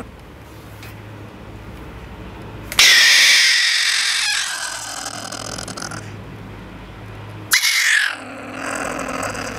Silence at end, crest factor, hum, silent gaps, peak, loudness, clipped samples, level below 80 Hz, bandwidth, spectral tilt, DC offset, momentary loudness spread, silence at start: 0 s; 20 dB; none; none; 0 dBFS; -14 LUFS; under 0.1%; -44 dBFS; 16 kHz; 0 dB/octave; under 0.1%; 27 LU; 0 s